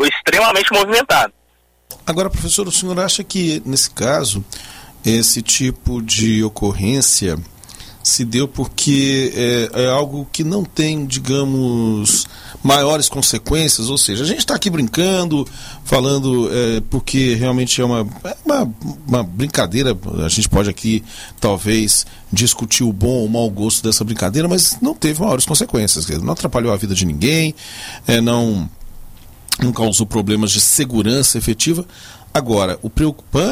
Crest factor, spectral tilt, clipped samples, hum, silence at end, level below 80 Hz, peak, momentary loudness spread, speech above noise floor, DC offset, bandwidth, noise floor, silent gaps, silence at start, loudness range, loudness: 16 dB; -3.5 dB/octave; under 0.1%; none; 0 s; -34 dBFS; 0 dBFS; 9 LU; 40 dB; under 0.1%; 16 kHz; -57 dBFS; none; 0 s; 3 LU; -15 LUFS